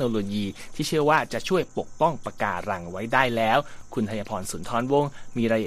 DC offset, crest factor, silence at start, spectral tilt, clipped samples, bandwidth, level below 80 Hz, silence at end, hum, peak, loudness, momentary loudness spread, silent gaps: under 0.1%; 20 dB; 0 s; -5 dB/octave; under 0.1%; 15 kHz; -48 dBFS; 0 s; none; -4 dBFS; -26 LUFS; 10 LU; none